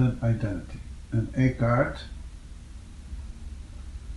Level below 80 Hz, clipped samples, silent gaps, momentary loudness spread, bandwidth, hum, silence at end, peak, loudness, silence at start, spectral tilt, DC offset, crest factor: -40 dBFS; under 0.1%; none; 21 LU; 11 kHz; none; 0 s; -10 dBFS; -27 LUFS; 0 s; -8.5 dB/octave; under 0.1%; 18 dB